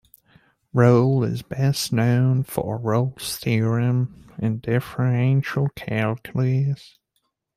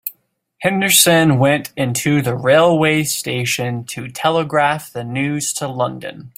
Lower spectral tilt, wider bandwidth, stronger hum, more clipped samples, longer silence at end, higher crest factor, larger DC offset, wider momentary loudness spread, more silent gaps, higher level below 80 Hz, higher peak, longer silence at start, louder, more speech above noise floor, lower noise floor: first, -7 dB/octave vs -4 dB/octave; about the same, 15.5 kHz vs 16.5 kHz; neither; neither; first, 0.8 s vs 0.1 s; about the same, 18 dB vs 16 dB; neither; second, 8 LU vs 12 LU; neither; about the same, -56 dBFS vs -56 dBFS; second, -4 dBFS vs 0 dBFS; first, 0.75 s vs 0.05 s; second, -22 LUFS vs -16 LUFS; first, 53 dB vs 41 dB; first, -73 dBFS vs -57 dBFS